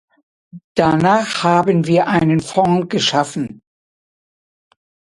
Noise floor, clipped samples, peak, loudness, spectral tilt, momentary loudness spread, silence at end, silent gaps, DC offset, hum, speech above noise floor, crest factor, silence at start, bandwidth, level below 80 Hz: under -90 dBFS; under 0.1%; 0 dBFS; -16 LUFS; -5.5 dB/octave; 9 LU; 1.6 s; 0.64-0.75 s; under 0.1%; none; over 75 dB; 18 dB; 0.55 s; 11.5 kHz; -52 dBFS